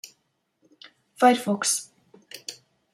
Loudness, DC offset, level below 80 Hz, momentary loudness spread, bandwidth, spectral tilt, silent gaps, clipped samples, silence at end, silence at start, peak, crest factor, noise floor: -22 LUFS; under 0.1%; -80 dBFS; 22 LU; 16 kHz; -2.5 dB/octave; none; under 0.1%; 0.4 s; 0.05 s; -4 dBFS; 24 dB; -73 dBFS